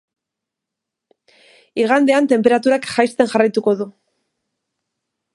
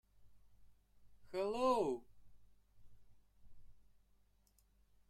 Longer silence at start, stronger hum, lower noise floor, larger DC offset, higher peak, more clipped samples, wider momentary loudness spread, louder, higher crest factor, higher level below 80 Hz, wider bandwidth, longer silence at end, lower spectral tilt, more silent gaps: first, 1.75 s vs 0.2 s; second, none vs 50 Hz at -75 dBFS; first, -83 dBFS vs -74 dBFS; neither; first, 0 dBFS vs -24 dBFS; neither; second, 8 LU vs 12 LU; first, -16 LUFS vs -39 LUFS; about the same, 18 dB vs 22 dB; about the same, -66 dBFS vs -70 dBFS; second, 11.5 kHz vs 14 kHz; about the same, 1.45 s vs 1.35 s; about the same, -5 dB/octave vs -5.5 dB/octave; neither